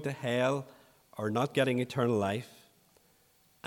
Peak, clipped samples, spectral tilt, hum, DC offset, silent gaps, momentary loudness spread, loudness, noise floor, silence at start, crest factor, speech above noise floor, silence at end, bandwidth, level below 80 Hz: -14 dBFS; under 0.1%; -6 dB/octave; none; under 0.1%; none; 17 LU; -31 LUFS; -67 dBFS; 0 s; 20 dB; 36 dB; 1.2 s; 18.5 kHz; -76 dBFS